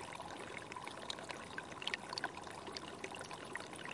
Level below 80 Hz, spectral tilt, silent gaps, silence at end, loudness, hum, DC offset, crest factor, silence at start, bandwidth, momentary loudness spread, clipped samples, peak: -74 dBFS; -2.5 dB/octave; none; 0 s; -46 LUFS; none; under 0.1%; 28 dB; 0 s; 11.5 kHz; 6 LU; under 0.1%; -18 dBFS